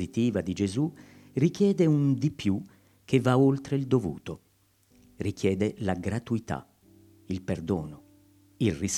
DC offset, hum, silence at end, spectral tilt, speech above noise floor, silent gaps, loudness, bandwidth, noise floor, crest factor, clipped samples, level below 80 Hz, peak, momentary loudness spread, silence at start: under 0.1%; none; 0 s; -6.5 dB/octave; 38 dB; none; -28 LUFS; 13.5 kHz; -65 dBFS; 20 dB; under 0.1%; -56 dBFS; -8 dBFS; 13 LU; 0 s